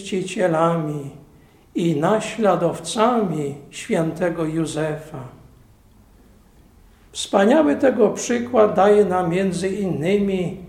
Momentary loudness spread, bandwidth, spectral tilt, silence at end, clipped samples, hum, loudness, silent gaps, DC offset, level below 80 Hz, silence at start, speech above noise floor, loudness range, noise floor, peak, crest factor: 15 LU; 14.5 kHz; -5.5 dB/octave; 0 s; under 0.1%; none; -20 LUFS; none; under 0.1%; -52 dBFS; 0 s; 31 dB; 9 LU; -51 dBFS; -2 dBFS; 20 dB